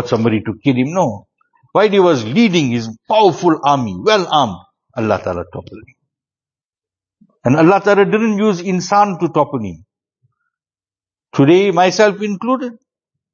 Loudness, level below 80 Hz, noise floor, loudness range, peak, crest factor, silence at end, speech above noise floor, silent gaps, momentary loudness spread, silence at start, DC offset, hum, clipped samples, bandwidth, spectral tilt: -14 LUFS; -54 dBFS; under -90 dBFS; 5 LU; 0 dBFS; 16 dB; 0.6 s; over 76 dB; 6.65-6.71 s; 12 LU; 0 s; under 0.1%; none; under 0.1%; 7.4 kHz; -6 dB/octave